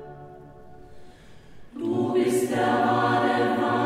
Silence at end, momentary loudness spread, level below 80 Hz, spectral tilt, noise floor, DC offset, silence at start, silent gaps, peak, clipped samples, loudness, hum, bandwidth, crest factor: 0 s; 22 LU; -58 dBFS; -5.5 dB/octave; -47 dBFS; under 0.1%; 0 s; none; -10 dBFS; under 0.1%; -23 LUFS; none; 16 kHz; 14 dB